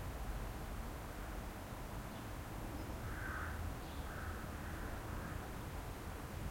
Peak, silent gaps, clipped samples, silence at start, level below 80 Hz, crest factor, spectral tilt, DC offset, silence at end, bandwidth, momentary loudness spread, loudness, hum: -32 dBFS; none; under 0.1%; 0 s; -50 dBFS; 14 dB; -5.5 dB/octave; under 0.1%; 0 s; 16.5 kHz; 4 LU; -47 LUFS; none